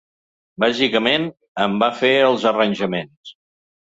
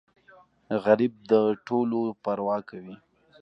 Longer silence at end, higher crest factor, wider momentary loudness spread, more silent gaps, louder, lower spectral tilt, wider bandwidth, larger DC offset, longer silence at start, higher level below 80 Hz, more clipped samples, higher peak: about the same, 0.55 s vs 0.45 s; about the same, 18 dB vs 20 dB; second, 10 LU vs 15 LU; first, 1.48-1.55 s, 3.17-3.24 s vs none; first, -18 LUFS vs -26 LUFS; second, -5 dB/octave vs -8.5 dB/octave; first, 7.8 kHz vs 6.2 kHz; neither; about the same, 0.6 s vs 0.7 s; first, -60 dBFS vs -72 dBFS; neither; first, -2 dBFS vs -6 dBFS